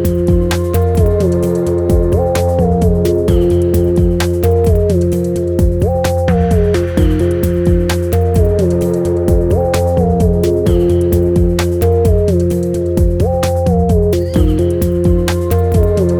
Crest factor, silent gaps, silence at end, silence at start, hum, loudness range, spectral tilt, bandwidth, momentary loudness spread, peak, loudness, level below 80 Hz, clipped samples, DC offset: 12 dB; none; 0 s; 0 s; none; 1 LU; -7.5 dB/octave; 19 kHz; 2 LU; 0 dBFS; -13 LUFS; -20 dBFS; under 0.1%; under 0.1%